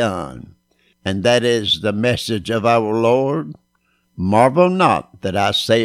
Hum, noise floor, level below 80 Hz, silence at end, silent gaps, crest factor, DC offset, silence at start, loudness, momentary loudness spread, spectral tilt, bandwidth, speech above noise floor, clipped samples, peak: none; -64 dBFS; -50 dBFS; 0 s; none; 16 dB; under 0.1%; 0 s; -17 LUFS; 11 LU; -5.5 dB/octave; 15.5 kHz; 48 dB; under 0.1%; 0 dBFS